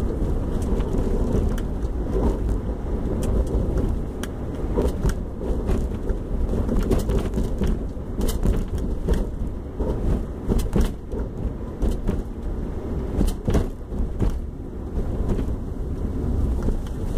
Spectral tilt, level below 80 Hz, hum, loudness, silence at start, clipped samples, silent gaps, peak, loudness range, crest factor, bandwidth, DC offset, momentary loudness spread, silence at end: -7.5 dB/octave; -26 dBFS; none; -27 LUFS; 0 s; under 0.1%; none; -6 dBFS; 2 LU; 16 dB; 15 kHz; under 0.1%; 7 LU; 0 s